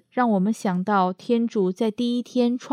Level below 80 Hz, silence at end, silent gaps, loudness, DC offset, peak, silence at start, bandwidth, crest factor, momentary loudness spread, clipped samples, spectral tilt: -78 dBFS; 0 s; none; -23 LUFS; under 0.1%; -8 dBFS; 0.15 s; 11 kHz; 14 dB; 3 LU; under 0.1%; -7 dB/octave